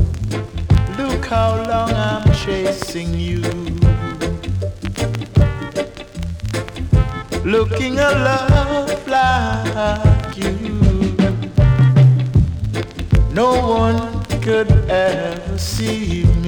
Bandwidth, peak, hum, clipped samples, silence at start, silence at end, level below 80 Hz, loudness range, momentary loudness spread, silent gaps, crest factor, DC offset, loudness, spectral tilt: 18.5 kHz; -2 dBFS; none; under 0.1%; 0 s; 0 s; -24 dBFS; 5 LU; 9 LU; none; 12 dB; under 0.1%; -17 LUFS; -6.5 dB/octave